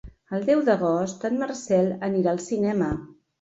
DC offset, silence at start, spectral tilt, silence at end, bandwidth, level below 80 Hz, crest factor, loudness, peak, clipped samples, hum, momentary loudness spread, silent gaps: under 0.1%; 0.05 s; -6.5 dB/octave; 0.35 s; 8 kHz; -52 dBFS; 16 dB; -24 LUFS; -8 dBFS; under 0.1%; none; 7 LU; none